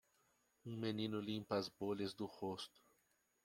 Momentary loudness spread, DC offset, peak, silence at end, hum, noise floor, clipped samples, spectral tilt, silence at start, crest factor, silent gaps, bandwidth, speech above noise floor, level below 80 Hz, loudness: 10 LU; under 0.1%; -26 dBFS; 0.8 s; none; -81 dBFS; under 0.1%; -6 dB/octave; 0.65 s; 20 dB; none; 16.5 kHz; 37 dB; -82 dBFS; -45 LUFS